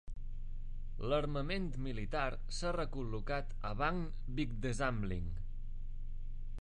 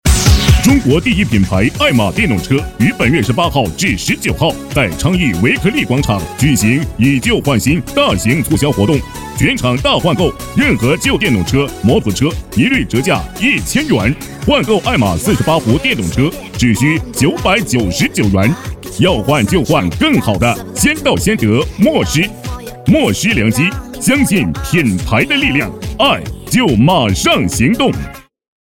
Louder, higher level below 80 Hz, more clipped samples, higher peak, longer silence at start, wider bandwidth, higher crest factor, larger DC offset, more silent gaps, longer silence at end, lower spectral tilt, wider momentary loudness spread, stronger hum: second, -40 LUFS vs -13 LUFS; second, -42 dBFS vs -26 dBFS; neither; second, -20 dBFS vs 0 dBFS; about the same, 0.05 s vs 0.05 s; second, 9.8 kHz vs 18.5 kHz; about the same, 16 dB vs 12 dB; second, under 0.1% vs 0.2%; neither; second, 0.05 s vs 0.55 s; about the same, -6 dB/octave vs -5 dB/octave; first, 14 LU vs 5 LU; neither